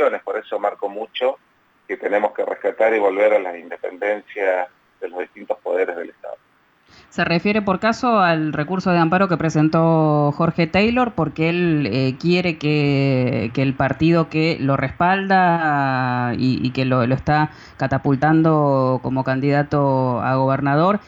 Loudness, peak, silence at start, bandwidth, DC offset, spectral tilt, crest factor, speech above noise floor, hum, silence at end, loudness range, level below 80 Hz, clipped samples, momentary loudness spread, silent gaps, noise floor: -19 LUFS; -4 dBFS; 0 s; 7.8 kHz; under 0.1%; -7.5 dB/octave; 14 dB; 40 dB; none; 0.1 s; 5 LU; -50 dBFS; under 0.1%; 11 LU; none; -58 dBFS